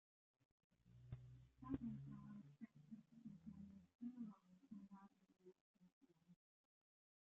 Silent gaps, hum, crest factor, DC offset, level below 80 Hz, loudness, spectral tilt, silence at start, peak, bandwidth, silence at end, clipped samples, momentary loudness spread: 3.95-3.99 s, 5.61-5.74 s, 5.92-6.01 s; none; 28 dB; under 0.1%; -76 dBFS; -58 LUFS; -9.5 dB/octave; 0.8 s; -32 dBFS; 7 kHz; 0.9 s; under 0.1%; 13 LU